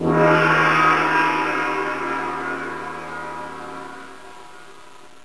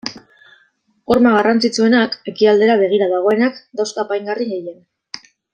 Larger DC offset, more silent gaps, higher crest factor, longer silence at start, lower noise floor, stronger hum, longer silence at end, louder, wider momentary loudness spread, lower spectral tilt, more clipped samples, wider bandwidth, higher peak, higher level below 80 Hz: first, 0.8% vs under 0.1%; neither; about the same, 18 dB vs 16 dB; about the same, 0 s vs 0.05 s; second, -46 dBFS vs -59 dBFS; neither; about the same, 0.4 s vs 0.35 s; second, -19 LUFS vs -15 LUFS; about the same, 21 LU vs 20 LU; about the same, -5.5 dB/octave vs -4.5 dB/octave; neither; first, 11 kHz vs 9.4 kHz; second, -4 dBFS vs 0 dBFS; about the same, -54 dBFS vs -58 dBFS